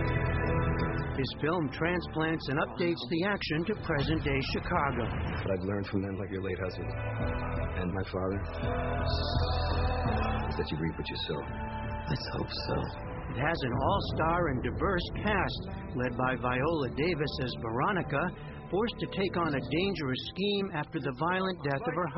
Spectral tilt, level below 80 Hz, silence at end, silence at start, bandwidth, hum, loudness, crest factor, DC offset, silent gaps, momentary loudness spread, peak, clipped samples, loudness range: -5 dB/octave; -42 dBFS; 0 s; 0 s; 5.8 kHz; none; -32 LUFS; 18 dB; under 0.1%; none; 5 LU; -14 dBFS; under 0.1%; 3 LU